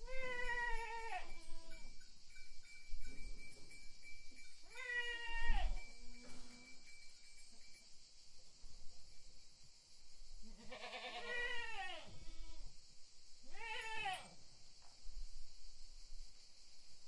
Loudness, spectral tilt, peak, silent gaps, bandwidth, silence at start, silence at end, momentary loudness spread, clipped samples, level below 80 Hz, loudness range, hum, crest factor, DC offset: -48 LUFS; -2.5 dB/octave; -22 dBFS; none; 11 kHz; 0 s; 0 s; 20 LU; under 0.1%; -50 dBFS; 14 LU; none; 20 dB; under 0.1%